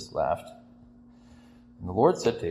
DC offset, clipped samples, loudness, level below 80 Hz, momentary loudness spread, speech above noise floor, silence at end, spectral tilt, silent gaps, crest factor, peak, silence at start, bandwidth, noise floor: under 0.1%; under 0.1%; -26 LUFS; -56 dBFS; 18 LU; 27 dB; 0 s; -6 dB/octave; none; 22 dB; -6 dBFS; 0 s; 13 kHz; -53 dBFS